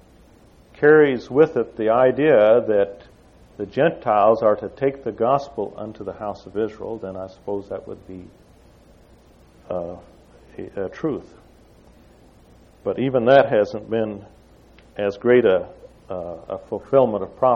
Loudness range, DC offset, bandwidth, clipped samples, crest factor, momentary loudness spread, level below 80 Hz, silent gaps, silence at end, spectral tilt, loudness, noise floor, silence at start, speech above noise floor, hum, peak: 16 LU; under 0.1%; 6.8 kHz; under 0.1%; 20 dB; 18 LU; -54 dBFS; none; 0 s; -8 dB/octave; -20 LUFS; -51 dBFS; 0.8 s; 31 dB; none; -2 dBFS